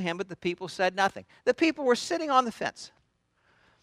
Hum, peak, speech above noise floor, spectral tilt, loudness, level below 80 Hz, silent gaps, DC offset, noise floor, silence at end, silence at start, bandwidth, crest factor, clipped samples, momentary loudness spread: none; -8 dBFS; 43 dB; -4 dB/octave; -28 LUFS; -70 dBFS; none; under 0.1%; -71 dBFS; 0.95 s; 0 s; 14 kHz; 22 dB; under 0.1%; 10 LU